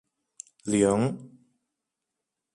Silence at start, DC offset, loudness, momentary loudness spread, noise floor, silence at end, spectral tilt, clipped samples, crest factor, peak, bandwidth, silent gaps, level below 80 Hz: 0.65 s; under 0.1%; -25 LUFS; 23 LU; -85 dBFS; 1.25 s; -6 dB/octave; under 0.1%; 20 dB; -10 dBFS; 11.5 kHz; none; -62 dBFS